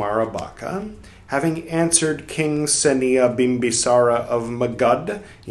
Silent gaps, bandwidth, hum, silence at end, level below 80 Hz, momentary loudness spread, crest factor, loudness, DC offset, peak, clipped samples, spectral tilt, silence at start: none; 13 kHz; none; 0 s; -50 dBFS; 12 LU; 20 dB; -19 LUFS; under 0.1%; 0 dBFS; under 0.1%; -4 dB/octave; 0 s